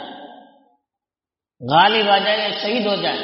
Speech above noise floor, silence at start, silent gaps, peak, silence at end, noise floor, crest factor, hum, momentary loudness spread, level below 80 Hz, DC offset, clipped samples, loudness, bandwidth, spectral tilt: over 73 dB; 0 s; none; -2 dBFS; 0 s; under -90 dBFS; 18 dB; none; 12 LU; -68 dBFS; under 0.1%; under 0.1%; -17 LUFS; 5.8 kHz; -1 dB/octave